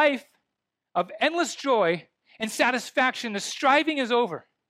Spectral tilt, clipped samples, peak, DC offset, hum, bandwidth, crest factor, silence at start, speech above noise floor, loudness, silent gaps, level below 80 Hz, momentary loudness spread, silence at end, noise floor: -3 dB/octave; under 0.1%; -8 dBFS; under 0.1%; none; 15.5 kHz; 18 dB; 0 s; 59 dB; -25 LUFS; none; -82 dBFS; 10 LU; 0.3 s; -84 dBFS